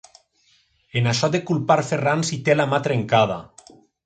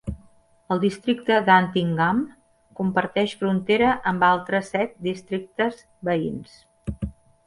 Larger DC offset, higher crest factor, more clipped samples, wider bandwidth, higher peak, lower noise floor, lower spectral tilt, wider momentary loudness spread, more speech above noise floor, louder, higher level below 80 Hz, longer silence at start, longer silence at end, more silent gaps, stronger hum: neither; about the same, 18 dB vs 20 dB; neither; second, 9.2 kHz vs 11.5 kHz; about the same, -4 dBFS vs -4 dBFS; first, -62 dBFS vs -55 dBFS; second, -5 dB/octave vs -6.5 dB/octave; second, 4 LU vs 17 LU; first, 42 dB vs 33 dB; about the same, -21 LUFS vs -23 LUFS; second, -58 dBFS vs -48 dBFS; first, 0.95 s vs 0.05 s; first, 0.6 s vs 0.35 s; neither; neither